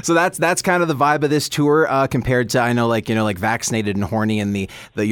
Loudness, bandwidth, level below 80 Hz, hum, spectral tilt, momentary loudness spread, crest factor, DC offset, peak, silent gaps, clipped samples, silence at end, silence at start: -18 LUFS; 19 kHz; -46 dBFS; none; -5 dB/octave; 5 LU; 14 dB; under 0.1%; -4 dBFS; none; under 0.1%; 0 s; 0.05 s